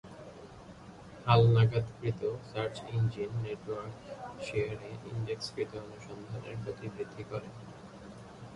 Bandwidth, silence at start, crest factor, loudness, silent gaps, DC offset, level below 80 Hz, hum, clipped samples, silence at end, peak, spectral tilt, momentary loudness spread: 10.5 kHz; 0.05 s; 20 dB; -33 LUFS; none; under 0.1%; -58 dBFS; none; under 0.1%; 0 s; -12 dBFS; -7 dB/octave; 22 LU